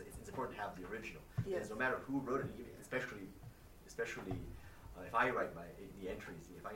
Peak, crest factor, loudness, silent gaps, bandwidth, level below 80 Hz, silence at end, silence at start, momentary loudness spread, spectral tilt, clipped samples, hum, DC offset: -22 dBFS; 22 dB; -42 LUFS; none; 16 kHz; -60 dBFS; 0 s; 0 s; 17 LU; -6 dB/octave; under 0.1%; none; under 0.1%